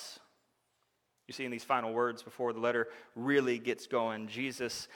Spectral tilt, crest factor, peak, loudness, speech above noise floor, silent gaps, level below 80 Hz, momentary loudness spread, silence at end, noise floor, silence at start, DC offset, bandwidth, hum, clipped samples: -4.5 dB/octave; 20 dB; -14 dBFS; -34 LUFS; 44 dB; none; -78 dBFS; 10 LU; 0 s; -78 dBFS; 0 s; under 0.1%; 17.5 kHz; none; under 0.1%